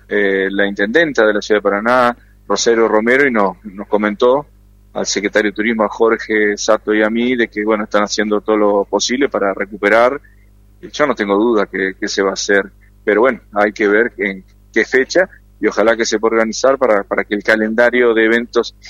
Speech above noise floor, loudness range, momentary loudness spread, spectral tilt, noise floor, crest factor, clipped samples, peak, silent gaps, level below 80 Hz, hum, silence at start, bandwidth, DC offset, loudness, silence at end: 31 dB; 2 LU; 7 LU; -3.5 dB/octave; -46 dBFS; 14 dB; under 0.1%; 0 dBFS; none; -46 dBFS; none; 0.1 s; 10.5 kHz; under 0.1%; -15 LUFS; 0 s